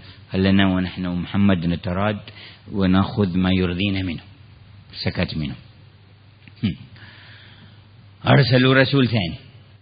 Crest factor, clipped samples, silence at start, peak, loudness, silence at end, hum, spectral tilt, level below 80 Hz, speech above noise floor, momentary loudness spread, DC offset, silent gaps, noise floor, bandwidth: 20 dB; under 0.1%; 0.05 s; 0 dBFS; -20 LUFS; 0.4 s; none; -11.5 dB/octave; -48 dBFS; 29 dB; 16 LU; under 0.1%; none; -49 dBFS; 5.2 kHz